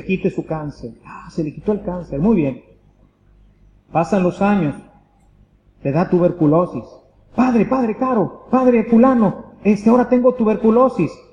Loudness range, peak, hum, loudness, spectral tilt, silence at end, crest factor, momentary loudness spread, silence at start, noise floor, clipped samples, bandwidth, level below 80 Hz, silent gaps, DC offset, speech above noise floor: 7 LU; -2 dBFS; 50 Hz at -45 dBFS; -17 LUFS; -9 dB/octave; 0.2 s; 16 dB; 13 LU; 0 s; -53 dBFS; under 0.1%; 9.4 kHz; -46 dBFS; none; under 0.1%; 36 dB